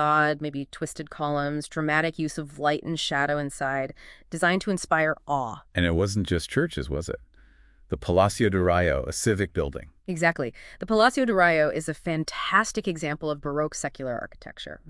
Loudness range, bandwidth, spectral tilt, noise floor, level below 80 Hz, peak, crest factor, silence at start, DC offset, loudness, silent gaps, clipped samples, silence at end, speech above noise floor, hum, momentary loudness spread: 3 LU; 12 kHz; -5 dB/octave; -55 dBFS; -46 dBFS; -4 dBFS; 20 dB; 0 s; under 0.1%; -26 LUFS; none; under 0.1%; 0 s; 29 dB; none; 13 LU